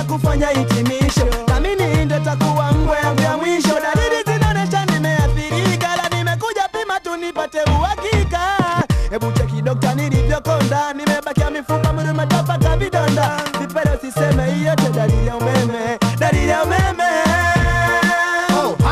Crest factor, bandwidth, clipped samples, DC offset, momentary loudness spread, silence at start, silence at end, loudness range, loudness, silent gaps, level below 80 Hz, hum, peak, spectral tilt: 12 dB; 15 kHz; under 0.1%; under 0.1%; 4 LU; 0 s; 0 s; 3 LU; -17 LUFS; none; -26 dBFS; none; -4 dBFS; -5.5 dB/octave